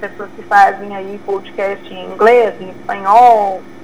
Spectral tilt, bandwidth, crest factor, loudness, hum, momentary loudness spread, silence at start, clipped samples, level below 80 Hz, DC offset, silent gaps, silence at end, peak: -5 dB/octave; 13 kHz; 14 dB; -12 LUFS; none; 18 LU; 0 s; 0.4%; -56 dBFS; 2%; none; 0.15 s; 0 dBFS